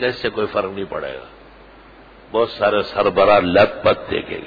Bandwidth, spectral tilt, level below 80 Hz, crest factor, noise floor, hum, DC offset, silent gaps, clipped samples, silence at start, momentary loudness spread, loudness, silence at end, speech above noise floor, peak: 5 kHz; -7 dB/octave; -46 dBFS; 18 dB; -44 dBFS; none; under 0.1%; none; under 0.1%; 0 s; 14 LU; -18 LUFS; 0 s; 26 dB; -2 dBFS